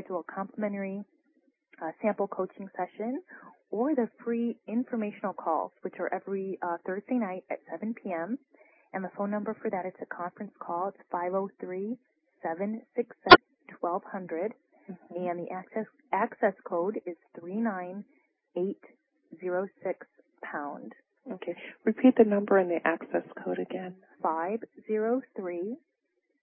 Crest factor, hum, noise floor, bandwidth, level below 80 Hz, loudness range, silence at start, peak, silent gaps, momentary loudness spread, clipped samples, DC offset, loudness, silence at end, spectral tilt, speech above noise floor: 30 dB; none; -78 dBFS; 3.5 kHz; -66 dBFS; 11 LU; 0 s; -2 dBFS; none; 15 LU; under 0.1%; under 0.1%; -30 LUFS; 0.65 s; -1 dB/octave; 48 dB